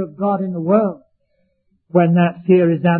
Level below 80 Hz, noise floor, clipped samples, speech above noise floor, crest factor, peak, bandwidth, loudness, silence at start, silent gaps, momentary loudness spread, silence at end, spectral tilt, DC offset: -62 dBFS; -65 dBFS; under 0.1%; 50 dB; 16 dB; -2 dBFS; 3.3 kHz; -16 LUFS; 0 s; none; 7 LU; 0 s; -13.5 dB/octave; under 0.1%